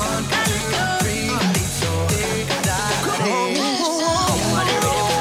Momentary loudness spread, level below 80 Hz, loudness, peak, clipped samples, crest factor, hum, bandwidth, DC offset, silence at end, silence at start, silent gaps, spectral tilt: 2 LU; -38 dBFS; -19 LUFS; -6 dBFS; under 0.1%; 14 dB; none; 17 kHz; under 0.1%; 0 s; 0 s; none; -3.5 dB/octave